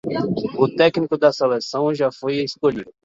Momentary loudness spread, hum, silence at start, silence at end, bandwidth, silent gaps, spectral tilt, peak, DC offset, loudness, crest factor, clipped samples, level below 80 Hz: 7 LU; none; 0.05 s; 0.15 s; 7.8 kHz; none; -6 dB/octave; -2 dBFS; under 0.1%; -20 LUFS; 18 dB; under 0.1%; -58 dBFS